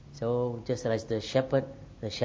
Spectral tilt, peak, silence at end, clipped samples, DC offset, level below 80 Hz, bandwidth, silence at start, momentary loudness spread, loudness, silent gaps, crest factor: -6 dB/octave; -12 dBFS; 0 s; under 0.1%; under 0.1%; -56 dBFS; 8 kHz; 0 s; 11 LU; -31 LUFS; none; 18 dB